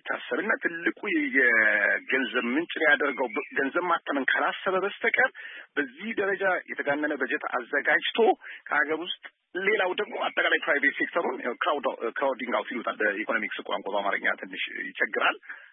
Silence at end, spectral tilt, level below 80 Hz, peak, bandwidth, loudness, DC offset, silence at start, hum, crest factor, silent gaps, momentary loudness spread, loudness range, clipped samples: 0.05 s; -7.5 dB/octave; -88 dBFS; -10 dBFS; 3.9 kHz; -26 LUFS; under 0.1%; 0.05 s; none; 18 dB; none; 9 LU; 4 LU; under 0.1%